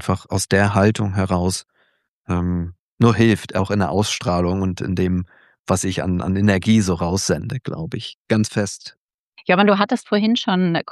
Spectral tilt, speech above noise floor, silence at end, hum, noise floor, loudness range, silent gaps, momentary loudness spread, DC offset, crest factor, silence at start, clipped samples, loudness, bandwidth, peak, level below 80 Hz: -5.5 dB/octave; 46 dB; 0 s; none; -64 dBFS; 1 LU; 2.08-2.24 s, 2.79-2.98 s, 5.59-5.65 s, 8.15-8.25 s, 8.97-9.33 s; 12 LU; under 0.1%; 18 dB; 0 s; under 0.1%; -19 LUFS; 12.5 kHz; -2 dBFS; -46 dBFS